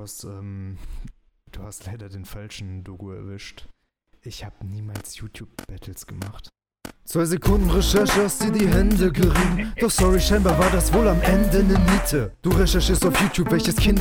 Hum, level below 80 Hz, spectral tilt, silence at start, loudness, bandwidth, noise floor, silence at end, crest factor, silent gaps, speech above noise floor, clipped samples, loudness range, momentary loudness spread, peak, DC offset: none; -26 dBFS; -5 dB/octave; 0 s; -20 LUFS; 19.5 kHz; -61 dBFS; 0 s; 16 dB; none; 40 dB; under 0.1%; 18 LU; 20 LU; -6 dBFS; under 0.1%